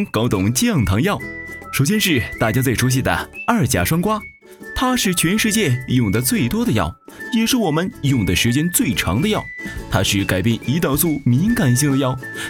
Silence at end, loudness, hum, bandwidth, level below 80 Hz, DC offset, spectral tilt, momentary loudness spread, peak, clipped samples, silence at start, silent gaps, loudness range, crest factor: 0 s; -18 LUFS; none; 19 kHz; -38 dBFS; under 0.1%; -4.5 dB/octave; 7 LU; -2 dBFS; under 0.1%; 0 s; none; 1 LU; 16 dB